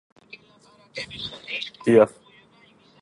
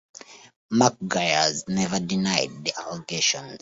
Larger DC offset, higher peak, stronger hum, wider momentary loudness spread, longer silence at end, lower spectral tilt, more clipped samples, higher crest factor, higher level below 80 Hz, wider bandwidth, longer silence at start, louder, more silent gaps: neither; about the same, -4 dBFS vs -4 dBFS; neither; first, 17 LU vs 10 LU; first, 0.95 s vs 0.05 s; first, -6 dB/octave vs -3 dB/octave; neither; about the same, 22 dB vs 22 dB; about the same, -62 dBFS vs -60 dBFS; first, 11.5 kHz vs 8 kHz; first, 0.95 s vs 0.3 s; about the same, -23 LUFS vs -24 LUFS; second, none vs 0.56-0.69 s